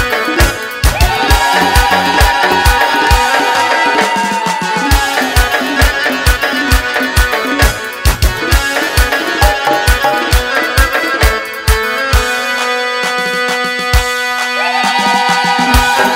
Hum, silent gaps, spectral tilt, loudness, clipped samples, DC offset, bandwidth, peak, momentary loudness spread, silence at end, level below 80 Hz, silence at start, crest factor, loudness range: none; none; -3.5 dB/octave; -11 LUFS; 0.2%; under 0.1%; 16.5 kHz; 0 dBFS; 4 LU; 0 s; -18 dBFS; 0 s; 12 dB; 3 LU